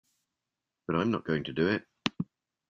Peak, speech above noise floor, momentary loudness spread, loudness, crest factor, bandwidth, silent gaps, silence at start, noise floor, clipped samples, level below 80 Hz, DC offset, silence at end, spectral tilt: -8 dBFS; 59 dB; 11 LU; -32 LUFS; 26 dB; 7.4 kHz; none; 0.9 s; -88 dBFS; under 0.1%; -66 dBFS; under 0.1%; 0.45 s; -6.5 dB/octave